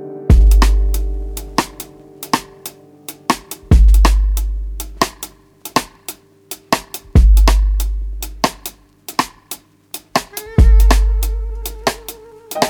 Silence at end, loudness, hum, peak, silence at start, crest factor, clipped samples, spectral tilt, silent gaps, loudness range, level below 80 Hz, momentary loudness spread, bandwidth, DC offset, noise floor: 0 s; -17 LUFS; none; 0 dBFS; 0 s; 14 dB; under 0.1%; -5 dB/octave; none; 3 LU; -16 dBFS; 20 LU; 19.5 kHz; under 0.1%; -37 dBFS